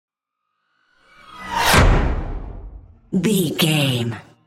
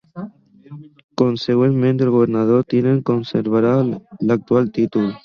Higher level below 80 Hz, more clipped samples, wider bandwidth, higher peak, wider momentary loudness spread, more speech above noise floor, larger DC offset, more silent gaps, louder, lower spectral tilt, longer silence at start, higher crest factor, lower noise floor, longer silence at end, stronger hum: first, -26 dBFS vs -58 dBFS; neither; first, 16.5 kHz vs 6.8 kHz; about the same, -2 dBFS vs -2 dBFS; first, 21 LU vs 7 LU; first, 58 dB vs 23 dB; neither; second, none vs 1.04-1.09 s; about the same, -18 LUFS vs -17 LUFS; second, -4.5 dB/octave vs -9 dB/octave; first, 1.3 s vs 0.15 s; about the same, 20 dB vs 16 dB; first, -77 dBFS vs -40 dBFS; first, 0.25 s vs 0.05 s; neither